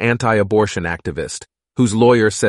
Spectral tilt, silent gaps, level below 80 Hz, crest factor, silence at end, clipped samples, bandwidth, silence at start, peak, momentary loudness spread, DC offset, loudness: -5.5 dB/octave; none; -44 dBFS; 14 dB; 0 s; under 0.1%; 11.5 kHz; 0 s; -2 dBFS; 15 LU; under 0.1%; -16 LUFS